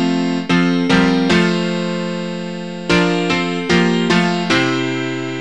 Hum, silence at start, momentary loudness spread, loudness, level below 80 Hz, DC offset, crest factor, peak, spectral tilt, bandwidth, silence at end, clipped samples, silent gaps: none; 0 s; 9 LU; -16 LUFS; -46 dBFS; 0.9%; 16 dB; 0 dBFS; -5.5 dB/octave; 10.5 kHz; 0 s; under 0.1%; none